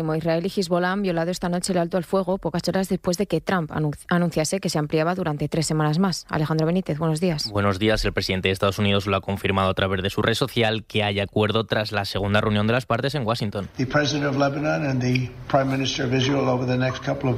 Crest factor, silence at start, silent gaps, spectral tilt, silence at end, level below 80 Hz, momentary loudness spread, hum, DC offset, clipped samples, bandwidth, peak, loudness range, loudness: 18 dB; 0 s; none; -5.5 dB/octave; 0 s; -46 dBFS; 4 LU; none; under 0.1%; under 0.1%; 15.5 kHz; -6 dBFS; 1 LU; -23 LUFS